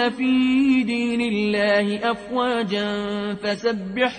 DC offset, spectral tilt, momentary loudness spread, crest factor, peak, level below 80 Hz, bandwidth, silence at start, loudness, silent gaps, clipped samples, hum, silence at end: under 0.1%; -5.5 dB/octave; 7 LU; 14 dB; -8 dBFS; -56 dBFS; 9.4 kHz; 0 s; -21 LUFS; none; under 0.1%; none; 0 s